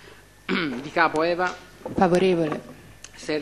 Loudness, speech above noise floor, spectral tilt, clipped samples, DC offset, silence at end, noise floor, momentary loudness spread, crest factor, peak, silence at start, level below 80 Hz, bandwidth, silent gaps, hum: -23 LUFS; 22 dB; -5.5 dB/octave; under 0.1%; 0.1%; 0 s; -45 dBFS; 18 LU; 20 dB; -4 dBFS; 0.05 s; -54 dBFS; 12.5 kHz; none; none